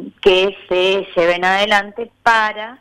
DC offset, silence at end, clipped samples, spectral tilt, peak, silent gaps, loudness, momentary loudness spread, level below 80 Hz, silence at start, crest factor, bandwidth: under 0.1%; 0.05 s; under 0.1%; -3.5 dB/octave; -2 dBFS; none; -15 LUFS; 5 LU; -46 dBFS; 0 s; 14 dB; 12.5 kHz